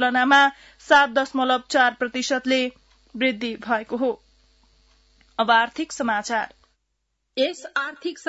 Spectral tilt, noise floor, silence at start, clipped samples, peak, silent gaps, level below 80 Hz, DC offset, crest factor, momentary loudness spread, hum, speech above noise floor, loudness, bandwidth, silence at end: -2.5 dB/octave; -75 dBFS; 0 s; under 0.1%; -6 dBFS; none; -62 dBFS; under 0.1%; 18 dB; 13 LU; none; 53 dB; -21 LUFS; 8 kHz; 0.1 s